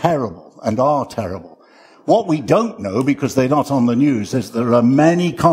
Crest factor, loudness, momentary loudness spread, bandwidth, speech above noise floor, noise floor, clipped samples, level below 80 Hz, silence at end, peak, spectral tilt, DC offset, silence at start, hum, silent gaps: 16 dB; -17 LUFS; 12 LU; 16 kHz; 32 dB; -47 dBFS; under 0.1%; -52 dBFS; 0 s; 0 dBFS; -7 dB/octave; under 0.1%; 0 s; none; none